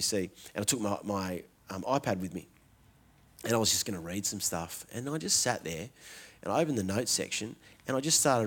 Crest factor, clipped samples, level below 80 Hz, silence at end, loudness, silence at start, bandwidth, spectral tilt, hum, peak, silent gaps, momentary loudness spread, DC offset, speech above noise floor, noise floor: 22 dB; under 0.1%; -68 dBFS; 0 s; -31 LUFS; 0 s; 19 kHz; -3 dB/octave; none; -12 dBFS; none; 16 LU; under 0.1%; 30 dB; -62 dBFS